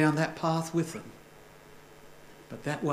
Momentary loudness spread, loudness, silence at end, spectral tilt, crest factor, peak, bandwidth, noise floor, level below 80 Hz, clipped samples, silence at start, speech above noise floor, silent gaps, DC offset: 24 LU; -31 LUFS; 0 s; -6 dB/octave; 22 dB; -10 dBFS; 15.5 kHz; -53 dBFS; -64 dBFS; under 0.1%; 0 s; 23 dB; none; under 0.1%